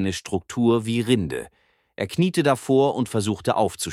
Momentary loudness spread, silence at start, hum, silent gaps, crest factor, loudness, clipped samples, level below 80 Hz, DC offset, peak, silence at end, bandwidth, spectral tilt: 10 LU; 0 s; none; none; 18 dB; -22 LUFS; under 0.1%; -54 dBFS; under 0.1%; -4 dBFS; 0 s; 15.5 kHz; -5.5 dB/octave